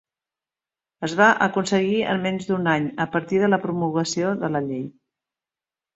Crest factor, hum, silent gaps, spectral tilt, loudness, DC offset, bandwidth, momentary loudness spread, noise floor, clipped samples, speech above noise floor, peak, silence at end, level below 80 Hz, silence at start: 20 dB; none; none; -5.5 dB/octave; -22 LUFS; under 0.1%; 8.2 kHz; 10 LU; under -90 dBFS; under 0.1%; over 69 dB; -2 dBFS; 1.05 s; -62 dBFS; 1 s